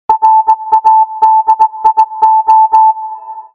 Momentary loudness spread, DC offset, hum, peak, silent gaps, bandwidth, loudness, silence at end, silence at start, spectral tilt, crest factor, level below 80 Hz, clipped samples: 4 LU; under 0.1%; none; 0 dBFS; none; 6.4 kHz; -8 LUFS; 0.1 s; 0.1 s; -3.5 dB/octave; 8 dB; -56 dBFS; 0.6%